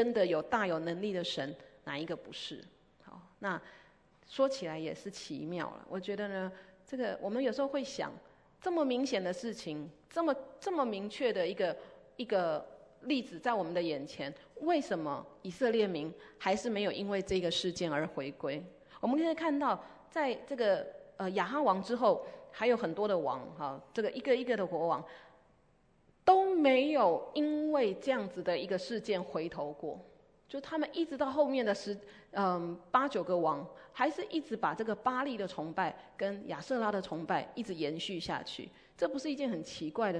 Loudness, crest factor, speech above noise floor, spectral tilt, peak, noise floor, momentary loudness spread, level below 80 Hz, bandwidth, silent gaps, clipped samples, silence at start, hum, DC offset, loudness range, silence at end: -35 LUFS; 22 dB; 34 dB; -5 dB/octave; -14 dBFS; -68 dBFS; 12 LU; -70 dBFS; 10.5 kHz; none; under 0.1%; 0 s; none; under 0.1%; 7 LU; 0 s